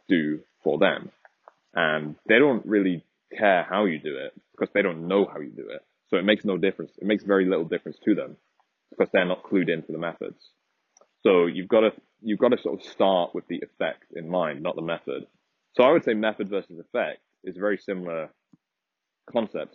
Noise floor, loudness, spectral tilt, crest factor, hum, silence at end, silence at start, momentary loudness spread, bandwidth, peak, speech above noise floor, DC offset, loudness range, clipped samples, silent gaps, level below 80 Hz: -84 dBFS; -25 LUFS; -4 dB/octave; 22 dB; none; 0.1 s; 0.1 s; 14 LU; 6.4 kHz; -4 dBFS; 60 dB; under 0.1%; 4 LU; under 0.1%; none; -74 dBFS